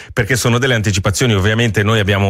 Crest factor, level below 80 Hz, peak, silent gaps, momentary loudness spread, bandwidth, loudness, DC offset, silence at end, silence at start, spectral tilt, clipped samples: 12 dB; -38 dBFS; -2 dBFS; none; 2 LU; 16 kHz; -14 LUFS; under 0.1%; 0 s; 0 s; -4.5 dB/octave; under 0.1%